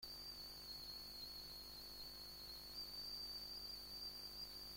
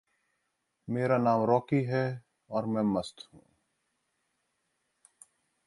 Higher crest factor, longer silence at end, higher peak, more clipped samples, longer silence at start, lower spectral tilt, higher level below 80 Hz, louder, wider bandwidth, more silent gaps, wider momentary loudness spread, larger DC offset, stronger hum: second, 14 dB vs 20 dB; second, 0 s vs 2.55 s; second, -40 dBFS vs -12 dBFS; neither; second, 0 s vs 0.9 s; second, -1.5 dB/octave vs -8 dB/octave; about the same, -68 dBFS vs -68 dBFS; second, -50 LUFS vs -29 LUFS; first, 16.5 kHz vs 11.5 kHz; neither; second, 4 LU vs 18 LU; neither; first, 50 Hz at -65 dBFS vs none